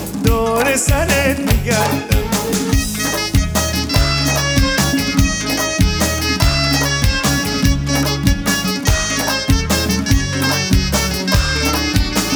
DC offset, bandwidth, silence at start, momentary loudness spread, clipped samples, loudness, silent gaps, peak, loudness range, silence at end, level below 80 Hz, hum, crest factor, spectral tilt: under 0.1%; over 20 kHz; 0 s; 3 LU; under 0.1%; -16 LUFS; none; 0 dBFS; 1 LU; 0 s; -22 dBFS; none; 16 dB; -4 dB/octave